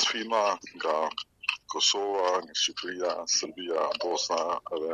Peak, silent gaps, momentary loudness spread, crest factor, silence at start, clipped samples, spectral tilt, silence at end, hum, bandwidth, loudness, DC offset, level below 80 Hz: -10 dBFS; none; 7 LU; 20 dB; 0 s; under 0.1%; 0 dB/octave; 0 s; none; 11.5 kHz; -28 LUFS; under 0.1%; -74 dBFS